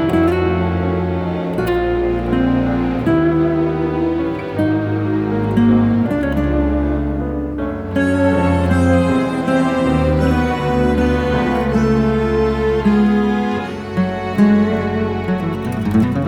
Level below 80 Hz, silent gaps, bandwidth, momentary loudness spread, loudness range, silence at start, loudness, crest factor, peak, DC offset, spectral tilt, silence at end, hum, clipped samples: -28 dBFS; none; 12.5 kHz; 6 LU; 2 LU; 0 s; -17 LUFS; 14 dB; -2 dBFS; under 0.1%; -8 dB/octave; 0 s; none; under 0.1%